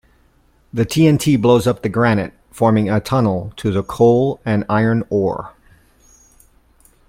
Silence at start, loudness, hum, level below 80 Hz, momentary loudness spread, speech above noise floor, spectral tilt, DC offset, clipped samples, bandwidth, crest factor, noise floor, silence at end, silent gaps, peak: 0.75 s; -16 LUFS; none; -46 dBFS; 9 LU; 40 dB; -7 dB/octave; under 0.1%; under 0.1%; 16.5 kHz; 16 dB; -55 dBFS; 1.6 s; none; -2 dBFS